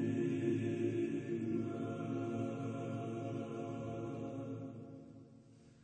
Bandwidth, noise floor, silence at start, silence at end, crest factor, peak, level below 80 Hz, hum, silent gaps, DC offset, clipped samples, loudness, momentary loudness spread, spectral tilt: 9 kHz; -61 dBFS; 0 s; 0 s; 16 dB; -24 dBFS; -74 dBFS; none; none; under 0.1%; under 0.1%; -40 LUFS; 15 LU; -8 dB/octave